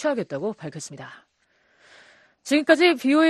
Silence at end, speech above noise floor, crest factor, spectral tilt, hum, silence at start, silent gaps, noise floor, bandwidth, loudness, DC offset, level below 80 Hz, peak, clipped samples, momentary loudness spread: 0 s; 44 dB; 20 dB; -4 dB/octave; none; 0 s; none; -65 dBFS; 13 kHz; -21 LUFS; under 0.1%; -74 dBFS; -4 dBFS; under 0.1%; 23 LU